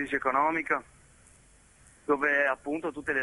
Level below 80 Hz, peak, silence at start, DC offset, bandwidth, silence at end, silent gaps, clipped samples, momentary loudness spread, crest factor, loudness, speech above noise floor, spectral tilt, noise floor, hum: -62 dBFS; -12 dBFS; 0 s; under 0.1%; 11.5 kHz; 0 s; none; under 0.1%; 8 LU; 18 dB; -28 LUFS; 30 dB; -5 dB/octave; -59 dBFS; none